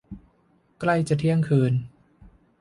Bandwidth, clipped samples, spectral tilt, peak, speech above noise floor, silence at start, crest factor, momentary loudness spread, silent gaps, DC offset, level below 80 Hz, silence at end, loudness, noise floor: 11.5 kHz; under 0.1%; -8 dB/octave; -8 dBFS; 42 dB; 0.1 s; 16 dB; 24 LU; none; under 0.1%; -54 dBFS; 0.75 s; -23 LUFS; -63 dBFS